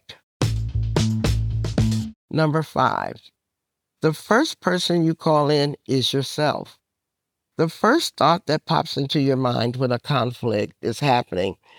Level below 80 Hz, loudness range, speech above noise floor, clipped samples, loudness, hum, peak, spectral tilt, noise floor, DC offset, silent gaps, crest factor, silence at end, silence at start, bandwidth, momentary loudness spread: -38 dBFS; 2 LU; 61 dB; under 0.1%; -22 LUFS; none; -4 dBFS; -5.5 dB/octave; -82 dBFS; under 0.1%; 0.23-0.40 s, 2.16-2.28 s; 18 dB; 0.25 s; 0.1 s; 18.5 kHz; 7 LU